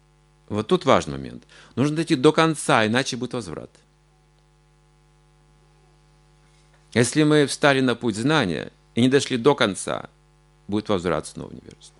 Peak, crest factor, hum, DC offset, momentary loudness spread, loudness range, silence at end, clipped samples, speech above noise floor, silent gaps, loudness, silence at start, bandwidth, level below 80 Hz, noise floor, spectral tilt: 0 dBFS; 22 dB; none; under 0.1%; 16 LU; 9 LU; 0.1 s; under 0.1%; 37 dB; none; -21 LUFS; 0.5 s; 11.5 kHz; -56 dBFS; -58 dBFS; -5 dB/octave